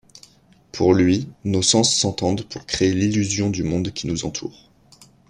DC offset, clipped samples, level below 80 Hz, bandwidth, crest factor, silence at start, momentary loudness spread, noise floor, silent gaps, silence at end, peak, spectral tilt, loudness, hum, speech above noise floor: under 0.1%; under 0.1%; -50 dBFS; 11 kHz; 18 dB; 0.75 s; 12 LU; -51 dBFS; none; 0.8 s; -4 dBFS; -4 dB/octave; -20 LUFS; none; 31 dB